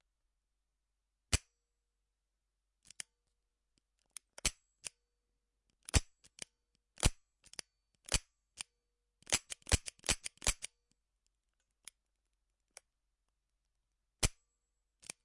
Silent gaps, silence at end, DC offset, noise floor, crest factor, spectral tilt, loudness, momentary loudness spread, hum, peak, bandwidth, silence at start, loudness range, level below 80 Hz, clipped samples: none; 0.95 s; under 0.1%; -87 dBFS; 32 dB; -2 dB/octave; -37 LUFS; 19 LU; none; -12 dBFS; 11.5 kHz; 1.3 s; 8 LU; -48 dBFS; under 0.1%